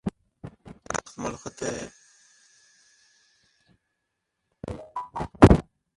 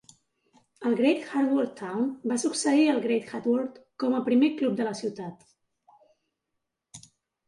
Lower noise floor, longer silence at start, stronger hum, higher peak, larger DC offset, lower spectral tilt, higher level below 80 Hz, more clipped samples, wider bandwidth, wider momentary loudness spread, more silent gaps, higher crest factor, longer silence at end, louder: about the same, -80 dBFS vs -83 dBFS; second, 0.05 s vs 0.8 s; neither; first, 0 dBFS vs -12 dBFS; neither; first, -6.5 dB/octave vs -4.5 dB/octave; first, -38 dBFS vs -76 dBFS; neither; about the same, 11.5 kHz vs 11.5 kHz; first, 28 LU vs 11 LU; neither; first, 28 dB vs 16 dB; second, 0.35 s vs 0.5 s; about the same, -25 LUFS vs -26 LUFS